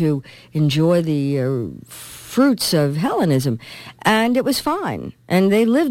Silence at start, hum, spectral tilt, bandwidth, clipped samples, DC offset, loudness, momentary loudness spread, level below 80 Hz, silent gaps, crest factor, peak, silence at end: 0 s; none; -6 dB/octave; 16.5 kHz; under 0.1%; under 0.1%; -19 LUFS; 14 LU; -54 dBFS; none; 16 dB; -2 dBFS; 0 s